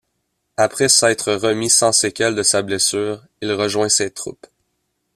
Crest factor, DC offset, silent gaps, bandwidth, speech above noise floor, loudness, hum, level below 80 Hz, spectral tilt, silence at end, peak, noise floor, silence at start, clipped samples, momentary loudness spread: 18 dB; under 0.1%; none; 15.5 kHz; 54 dB; -16 LUFS; none; -58 dBFS; -2 dB/octave; 0.85 s; 0 dBFS; -72 dBFS; 0.6 s; under 0.1%; 13 LU